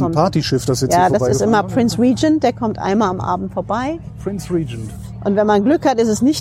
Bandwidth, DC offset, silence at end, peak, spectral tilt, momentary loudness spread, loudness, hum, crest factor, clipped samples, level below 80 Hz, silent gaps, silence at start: 16 kHz; under 0.1%; 0 s; -2 dBFS; -6 dB/octave; 11 LU; -17 LUFS; none; 14 dB; under 0.1%; -40 dBFS; none; 0 s